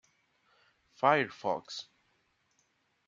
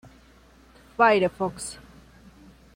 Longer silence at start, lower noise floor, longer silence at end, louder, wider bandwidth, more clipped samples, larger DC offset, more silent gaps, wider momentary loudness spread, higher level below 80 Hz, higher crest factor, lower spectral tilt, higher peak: about the same, 1 s vs 1 s; first, -75 dBFS vs -54 dBFS; first, 1.25 s vs 1 s; second, -30 LUFS vs -23 LUFS; second, 7.6 kHz vs 16.5 kHz; neither; neither; neither; second, 16 LU vs 21 LU; second, -82 dBFS vs -56 dBFS; first, 26 dB vs 20 dB; about the same, -4.5 dB/octave vs -4.5 dB/octave; second, -10 dBFS vs -6 dBFS